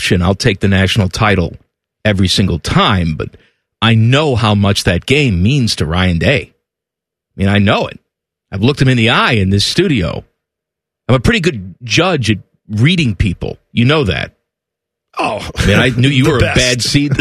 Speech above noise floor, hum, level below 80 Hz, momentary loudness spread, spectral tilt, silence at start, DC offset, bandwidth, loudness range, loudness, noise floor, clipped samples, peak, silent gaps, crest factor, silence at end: 70 dB; none; -32 dBFS; 9 LU; -5.5 dB/octave; 0 s; under 0.1%; 14 kHz; 3 LU; -12 LUFS; -82 dBFS; under 0.1%; 0 dBFS; none; 14 dB; 0 s